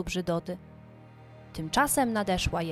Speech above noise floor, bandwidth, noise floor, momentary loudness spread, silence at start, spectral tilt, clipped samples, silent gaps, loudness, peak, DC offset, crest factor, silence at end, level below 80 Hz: 22 dB; 16.5 kHz; -50 dBFS; 16 LU; 0 s; -4 dB/octave; under 0.1%; none; -28 LUFS; -12 dBFS; under 0.1%; 18 dB; 0 s; -46 dBFS